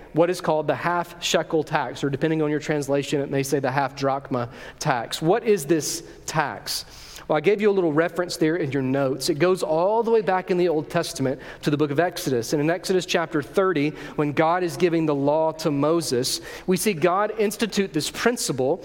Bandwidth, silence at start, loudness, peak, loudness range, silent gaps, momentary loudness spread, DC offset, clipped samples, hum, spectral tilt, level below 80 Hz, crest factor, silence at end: 17 kHz; 0 s; -23 LUFS; -4 dBFS; 2 LU; none; 6 LU; under 0.1%; under 0.1%; none; -5 dB/octave; -54 dBFS; 20 dB; 0 s